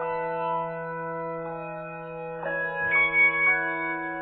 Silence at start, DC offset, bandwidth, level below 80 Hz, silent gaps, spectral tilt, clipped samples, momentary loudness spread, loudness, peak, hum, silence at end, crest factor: 0 s; under 0.1%; 4.3 kHz; -60 dBFS; none; -8.5 dB/octave; under 0.1%; 17 LU; -25 LUFS; -12 dBFS; none; 0 s; 16 dB